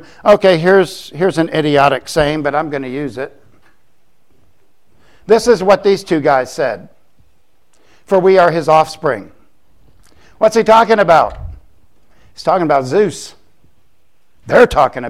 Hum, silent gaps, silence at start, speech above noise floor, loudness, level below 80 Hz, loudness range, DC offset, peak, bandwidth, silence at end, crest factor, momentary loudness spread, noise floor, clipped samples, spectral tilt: none; none; 0.25 s; 50 dB; -13 LUFS; -42 dBFS; 6 LU; 0.7%; 0 dBFS; 15 kHz; 0 s; 14 dB; 13 LU; -62 dBFS; under 0.1%; -5.5 dB/octave